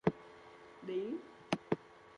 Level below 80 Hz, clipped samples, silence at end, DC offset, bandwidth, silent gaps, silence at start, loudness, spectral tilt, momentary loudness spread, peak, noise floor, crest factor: -70 dBFS; under 0.1%; 0 s; under 0.1%; 10.5 kHz; none; 0.05 s; -41 LUFS; -6.5 dB/octave; 18 LU; -18 dBFS; -57 dBFS; 24 dB